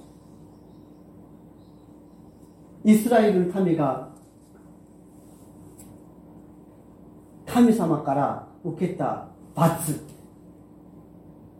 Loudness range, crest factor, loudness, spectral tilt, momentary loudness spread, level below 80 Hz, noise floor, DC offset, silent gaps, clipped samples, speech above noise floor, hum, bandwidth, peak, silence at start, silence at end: 5 LU; 22 dB; -23 LUFS; -7 dB/octave; 25 LU; -60 dBFS; -50 dBFS; under 0.1%; none; under 0.1%; 29 dB; none; 16.5 kHz; -6 dBFS; 2.85 s; 0.6 s